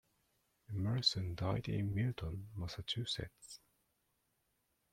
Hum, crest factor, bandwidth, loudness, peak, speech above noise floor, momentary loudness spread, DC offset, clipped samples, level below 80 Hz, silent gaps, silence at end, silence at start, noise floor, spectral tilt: none; 22 dB; 15 kHz; -39 LUFS; -18 dBFS; 42 dB; 16 LU; under 0.1%; under 0.1%; -60 dBFS; none; 1.35 s; 0.7 s; -81 dBFS; -5.5 dB/octave